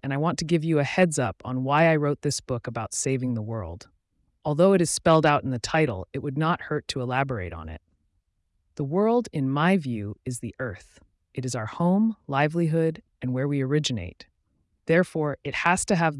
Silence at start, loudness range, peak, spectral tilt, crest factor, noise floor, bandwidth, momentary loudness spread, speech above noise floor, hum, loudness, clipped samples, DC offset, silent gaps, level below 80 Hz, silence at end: 0.05 s; 4 LU; -8 dBFS; -5.5 dB/octave; 16 dB; -73 dBFS; 12 kHz; 14 LU; 48 dB; none; -25 LUFS; under 0.1%; under 0.1%; none; -56 dBFS; 0 s